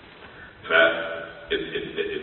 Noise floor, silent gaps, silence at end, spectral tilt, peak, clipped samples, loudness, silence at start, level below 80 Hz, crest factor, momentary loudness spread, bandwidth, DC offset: -45 dBFS; none; 0 s; -8 dB/octave; -6 dBFS; under 0.1%; -24 LUFS; 0.05 s; -56 dBFS; 20 dB; 25 LU; 4.3 kHz; under 0.1%